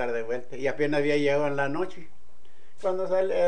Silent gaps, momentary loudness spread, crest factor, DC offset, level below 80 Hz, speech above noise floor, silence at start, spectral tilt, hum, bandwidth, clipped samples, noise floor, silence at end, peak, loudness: none; 9 LU; 14 dB; 3%; -66 dBFS; 33 dB; 0 s; -6 dB/octave; none; 9.8 kHz; under 0.1%; -59 dBFS; 0 s; -12 dBFS; -27 LUFS